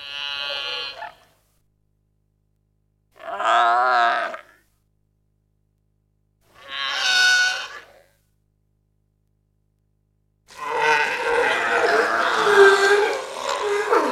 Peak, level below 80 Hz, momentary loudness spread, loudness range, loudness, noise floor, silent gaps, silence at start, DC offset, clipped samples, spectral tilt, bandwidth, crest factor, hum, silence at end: -2 dBFS; -64 dBFS; 19 LU; 11 LU; -19 LUFS; -67 dBFS; none; 0 s; under 0.1%; under 0.1%; -1 dB/octave; 14.5 kHz; 22 dB; 50 Hz at -85 dBFS; 0 s